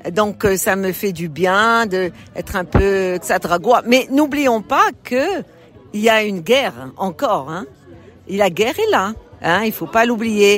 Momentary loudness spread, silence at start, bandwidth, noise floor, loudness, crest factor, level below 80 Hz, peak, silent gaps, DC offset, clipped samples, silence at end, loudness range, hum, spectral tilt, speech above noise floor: 10 LU; 0.05 s; 16.5 kHz; -42 dBFS; -17 LUFS; 16 dB; -38 dBFS; -2 dBFS; none; under 0.1%; under 0.1%; 0 s; 3 LU; none; -4.5 dB/octave; 25 dB